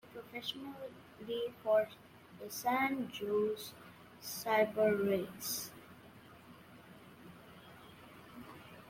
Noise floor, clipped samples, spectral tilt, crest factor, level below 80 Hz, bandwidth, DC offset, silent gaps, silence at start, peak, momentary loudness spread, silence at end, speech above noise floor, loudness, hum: -57 dBFS; under 0.1%; -4 dB/octave; 20 dB; -76 dBFS; 16.5 kHz; under 0.1%; none; 0.05 s; -18 dBFS; 24 LU; 0 s; 21 dB; -36 LUFS; none